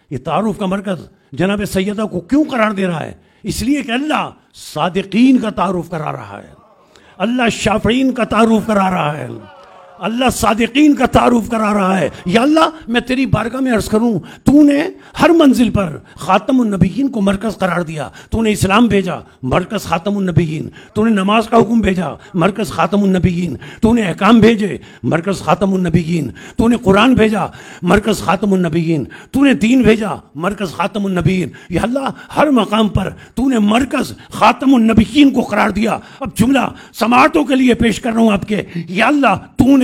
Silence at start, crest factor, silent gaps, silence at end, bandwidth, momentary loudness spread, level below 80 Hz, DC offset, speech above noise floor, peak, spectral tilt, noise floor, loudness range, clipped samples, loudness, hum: 0.1 s; 14 dB; none; 0 s; 16 kHz; 12 LU; -36 dBFS; under 0.1%; 32 dB; 0 dBFS; -6 dB/octave; -46 dBFS; 4 LU; under 0.1%; -14 LUFS; none